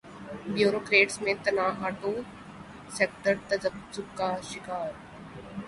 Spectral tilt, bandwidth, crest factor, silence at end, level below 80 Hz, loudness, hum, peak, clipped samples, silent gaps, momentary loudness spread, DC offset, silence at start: -4 dB/octave; 11.5 kHz; 22 dB; 0 s; -60 dBFS; -28 LUFS; none; -8 dBFS; under 0.1%; none; 22 LU; under 0.1%; 0.05 s